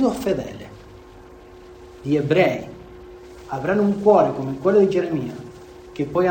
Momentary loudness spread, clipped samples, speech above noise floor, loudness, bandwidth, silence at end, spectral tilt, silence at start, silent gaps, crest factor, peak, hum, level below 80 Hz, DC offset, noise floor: 24 LU; under 0.1%; 24 dB; -20 LUFS; 19 kHz; 0 s; -7.5 dB/octave; 0 s; none; 18 dB; -4 dBFS; none; -50 dBFS; under 0.1%; -43 dBFS